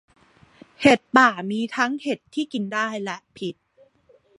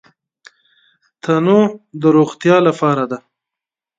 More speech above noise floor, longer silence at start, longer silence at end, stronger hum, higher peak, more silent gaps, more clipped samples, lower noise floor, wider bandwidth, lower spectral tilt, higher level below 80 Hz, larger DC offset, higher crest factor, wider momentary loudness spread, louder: second, 37 dB vs 73 dB; second, 0.8 s vs 1.25 s; about the same, 0.85 s vs 0.8 s; neither; about the same, -2 dBFS vs 0 dBFS; neither; neither; second, -59 dBFS vs -86 dBFS; first, 11.5 kHz vs 7.8 kHz; second, -4.5 dB/octave vs -7.5 dB/octave; about the same, -62 dBFS vs -64 dBFS; neither; first, 22 dB vs 16 dB; first, 16 LU vs 11 LU; second, -22 LUFS vs -14 LUFS